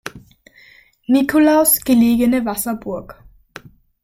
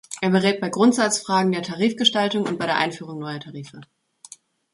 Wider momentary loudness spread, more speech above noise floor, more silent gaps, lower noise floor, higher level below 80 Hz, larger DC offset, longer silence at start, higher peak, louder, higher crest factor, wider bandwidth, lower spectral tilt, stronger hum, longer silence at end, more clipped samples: about the same, 17 LU vs 15 LU; first, 34 dB vs 26 dB; neither; about the same, -49 dBFS vs -48 dBFS; first, -48 dBFS vs -66 dBFS; neither; about the same, 0.05 s vs 0.1 s; about the same, -4 dBFS vs -2 dBFS; first, -15 LUFS vs -21 LUFS; second, 14 dB vs 20 dB; first, 16.5 kHz vs 11.5 kHz; about the same, -4 dB/octave vs -4 dB/octave; neither; about the same, 0.9 s vs 0.9 s; neither